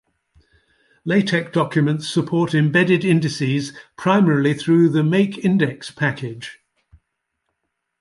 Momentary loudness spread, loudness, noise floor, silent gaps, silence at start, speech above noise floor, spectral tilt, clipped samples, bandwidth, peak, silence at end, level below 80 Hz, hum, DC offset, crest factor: 11 LU; -18 LUFS; -76 dBFS; none; 1.05 s; 58 dB; -6.5 dB/octave; under 0.1%; 11.5 kHz; -2 dBFS; 1.5 s; -60 dBFS; none; under 0.1%; 16 dB